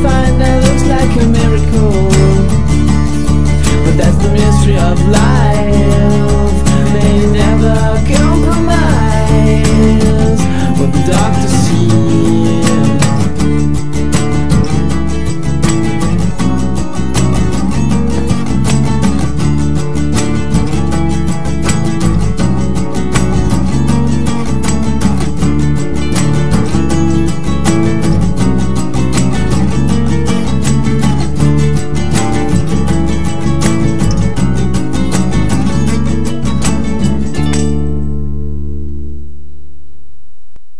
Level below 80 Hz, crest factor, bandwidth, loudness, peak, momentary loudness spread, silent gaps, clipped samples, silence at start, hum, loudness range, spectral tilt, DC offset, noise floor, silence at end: -18 dBFS; 12 dB; 11 kHz; -12 LUFS; 0 dBFS; 5 LU; none; 0.5%; 0 s; none; 4 LU; -6.5 dB/octave; 20%; -44 dBFS; 0 s